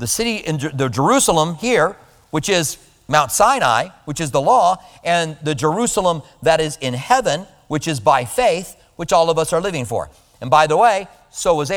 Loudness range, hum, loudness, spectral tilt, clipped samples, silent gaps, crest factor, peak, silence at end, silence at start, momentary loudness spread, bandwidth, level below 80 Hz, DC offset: 2 LU; none; -17 LUFS; -4 dB/octave; under 0.1%; none; 18 dB; 0 dBFS; 0 s; 0 s; 11 LU; over 20 kHz; -46 dBFS; under 0.1%